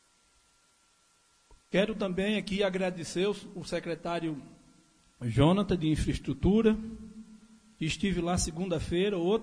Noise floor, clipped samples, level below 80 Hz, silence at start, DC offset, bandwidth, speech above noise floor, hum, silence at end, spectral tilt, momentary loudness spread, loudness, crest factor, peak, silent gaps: -67 dBFS; under 0.1%; -46 dBFS; 1.5 s; under 0.1%; 10.5 kHz; 38 dB; none; 0 s; -5.5 dB/octave; 13 LU; -30 LUFS; 20 dB; -10 dBFS; none